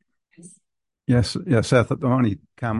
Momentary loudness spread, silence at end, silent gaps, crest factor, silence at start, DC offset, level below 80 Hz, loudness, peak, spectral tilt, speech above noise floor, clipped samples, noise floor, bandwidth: 8 LU; 0 s; none; 18 dB; 0.45 s; under 0.1%; -44 dBFS; -21 LUFS; -4 dBFS; -6.5 dB/octave; 53 dB; under 0.1%; -74 dBFS; 11.5 kHz